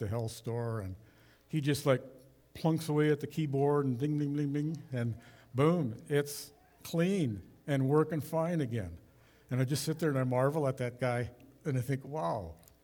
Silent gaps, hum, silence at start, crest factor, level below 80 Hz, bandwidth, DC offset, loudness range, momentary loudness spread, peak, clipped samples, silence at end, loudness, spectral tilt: none; none; 0 s; 18 dB; -66 dBFS; over 20 kHz; under 0.1%; 2 LU; 12 LU; -14 dBFS; under 0.1%; 0.3 s; -33 LUFS; -7 dB/octave